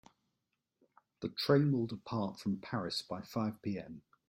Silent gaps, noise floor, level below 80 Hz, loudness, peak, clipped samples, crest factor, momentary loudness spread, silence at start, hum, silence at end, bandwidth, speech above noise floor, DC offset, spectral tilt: none; -86 dBFS; -72 dBFS; -36 LUFS; -16 dBFS; under 0.1%; 22 dB; 13 LU; 1.2 s; none; 0.3 s; 16 kHz; 50 dB; under 0.1%; -6.5 dB/octave